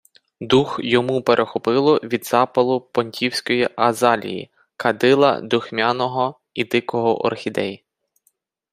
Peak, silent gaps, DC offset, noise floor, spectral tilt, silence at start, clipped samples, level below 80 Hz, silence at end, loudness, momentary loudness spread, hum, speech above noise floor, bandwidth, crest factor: -2 dBFS; none; under 0.1%; -66 dBFS; -5 dB/octave; 0.4 s; under 0.1%; -60 dBFS; 0.95 s; -19 LUFS; 8 LU; none; 48 dB; 15.5 kHz; 18 dB